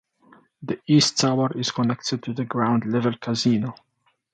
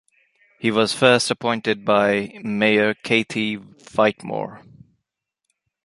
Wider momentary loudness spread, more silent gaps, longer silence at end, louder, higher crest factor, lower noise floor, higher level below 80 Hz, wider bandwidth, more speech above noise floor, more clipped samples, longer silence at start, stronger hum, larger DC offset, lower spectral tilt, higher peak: about the same, 12 LU vs 13 LU; neither; second, 0.6 s vs 1.25 s; second, -23 LUFS vs -20 LUFS; about the same, 18 dB vs 20 dB; second, -56 dBFS vs -81 dBFS; about the same, -64 dBFS vs -62 dBFS; second, 9.2 kHz vs 11.5 kHz; second, 33 dB vs 60 dB; neither; about the same, 0.6 s vs 0.6 s; neither; neither; about the same, -5 dB/octave vs -4.5 dB/octave; second, -6 dBFS vs -2 dBFS